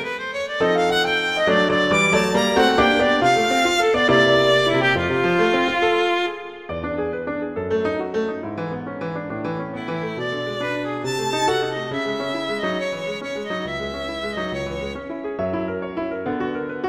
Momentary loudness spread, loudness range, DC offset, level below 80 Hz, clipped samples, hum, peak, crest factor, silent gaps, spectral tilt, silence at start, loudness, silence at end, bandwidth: 12 LU; 10 LU; under 0.1%; -48 dBFS; under 0.1%; none; -2 dBFS; 18 dB; none; -4.5 dB/octave; 0 s; -21 LUFS; 0 s; 16 kHz